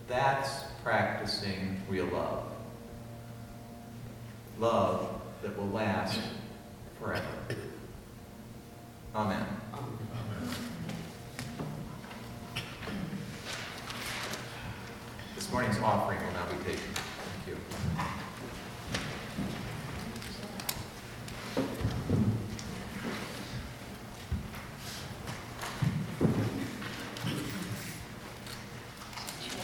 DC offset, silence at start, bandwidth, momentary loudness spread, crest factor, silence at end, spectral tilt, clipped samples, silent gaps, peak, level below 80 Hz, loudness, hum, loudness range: under 0.1%; 0 s; 19 kHz; 15 LU; 22 dB; 0 s; -5 dB/octave; under 0.1%; none; -14 dBFS; -52 dBFS; -36 LUFS; none; 6 LU